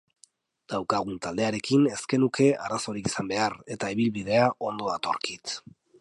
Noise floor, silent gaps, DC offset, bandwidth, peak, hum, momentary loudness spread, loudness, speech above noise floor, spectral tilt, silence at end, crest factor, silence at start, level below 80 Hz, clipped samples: -62 dBFS; none; under 0.1%; 11.5 kHz; -8 dBFS; none; 9 LU; -27 LUFS; 35 dB; -5 dB/octave; 0.4 s; 18 dB; 0.7 s; -62 dBFS; under 0.1%